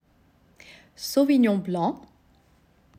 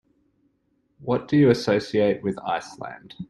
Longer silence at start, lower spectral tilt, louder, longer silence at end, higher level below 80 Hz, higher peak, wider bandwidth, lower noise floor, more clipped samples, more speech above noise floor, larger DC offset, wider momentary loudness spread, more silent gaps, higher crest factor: about the same, 1 s vs 1 s; about the same, -6 dB/octave vs -7 dB/octave; about the same, -24 LUFS vs -22 LUFS; first, 1.05 s vs 0.05 s; second, -64 dBFS vs -58 dBFS; second, -10 dBFS vs -4 dBFS; first, 15.5 kHz vs 11.5 kHz; second, -61 dBFS vs -69 dBFS; neither; second, 39 dB vs 46 dB; neither; second, 14 LU vs 19 LU; neither; about the same, 16 dB vs 20 dB